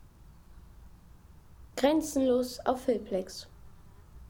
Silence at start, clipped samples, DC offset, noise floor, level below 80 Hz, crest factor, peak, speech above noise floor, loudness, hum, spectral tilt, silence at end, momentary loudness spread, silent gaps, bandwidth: 0.4 s; under 0.1%; under 0.1%; -54 dBFS; -56 dBFS; 22 dB; -12 dBFS; 25 dB; -30 LUFS; none; -4.5 dB/octave; 0.05 s; 16 LU; none; 19.5 kHz